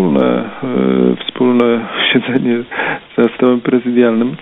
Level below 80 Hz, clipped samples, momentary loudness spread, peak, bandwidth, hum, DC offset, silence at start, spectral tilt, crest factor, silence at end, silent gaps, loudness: -56 dBFS; under 0.1%; 6 LU; 0 dBFS; 4 kHz; none; under 0.1%; 0 s; -9 dB/octave; 14 dB; 0.05 s; none; -14 LUFS